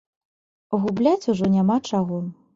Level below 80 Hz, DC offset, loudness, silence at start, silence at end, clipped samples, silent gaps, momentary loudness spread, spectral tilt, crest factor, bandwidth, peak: -58 dBFS; under 0.1%; -22 LUFS; 0.7 s; 0.2 s; under 0.1%; none; 8 LU; -7.5 dB/octave; 16 dB; 7.6 kHz; -8 dBFS